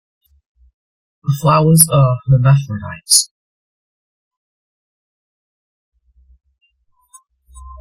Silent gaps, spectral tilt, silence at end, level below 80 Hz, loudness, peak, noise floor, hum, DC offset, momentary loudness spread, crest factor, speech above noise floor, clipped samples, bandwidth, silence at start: 3.31-4.31 s, 4.37-5.92 s; -4.5 dB/octave; 0.05 s; -46 dBFS; -12 LUFS; 0 dBFS; -61 dBFS; none; under 0.1%; 17 LU; 18 dB; 48 dB; under 0.1%; 16.5 kHz; 1.25 s